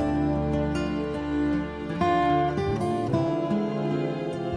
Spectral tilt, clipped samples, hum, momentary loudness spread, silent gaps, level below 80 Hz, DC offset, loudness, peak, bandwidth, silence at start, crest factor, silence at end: -8 dB/octave; under 0.1%; none; 6 LU; none; -42 dBFS; under 0.1%; -26 LUFS; -14 dBFS; 10 kHz; 0 s; 12 dB; 0 s